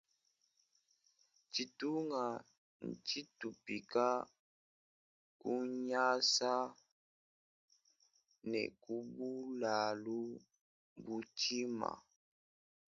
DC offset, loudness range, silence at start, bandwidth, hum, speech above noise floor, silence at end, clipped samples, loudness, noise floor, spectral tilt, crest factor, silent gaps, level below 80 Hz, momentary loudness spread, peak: under 0.1%; 6 LU; 1.55 s; 7.4 kHz; none; 41 dB; 0.95 s; under 0.1%; -39 LUFS; -81 dBFS; -2 dB/octave; 22 dB; 2.58-2.80 s, 4.39-5.40 s, 6.92-7.68 s, 10.61-10.96 s; -84 dBFS; 14 LU; -20 dBFS